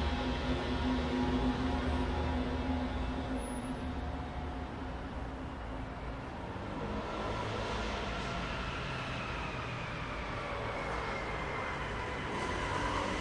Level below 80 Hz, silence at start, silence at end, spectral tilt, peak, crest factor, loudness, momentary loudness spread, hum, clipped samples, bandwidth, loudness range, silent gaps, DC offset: -42 dBFS; 0 s; 0 s; -6 dB/octave; -20 dBFS; 16 dB; -37 LUFS; 8 LU; none; under 0.1%; 11 kHz; 6 LU; none; under 0.1%